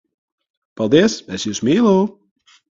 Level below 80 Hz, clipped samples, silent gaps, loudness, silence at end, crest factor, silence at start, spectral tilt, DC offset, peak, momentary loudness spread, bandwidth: -54 dBFS; under 0.1%; none; -17 LUFS; 0.7 s; 18 dB; 0.8 s; -5.5 dB/octave; under 0.1%; 0 dBFS; 10 LU; 7.8 kHz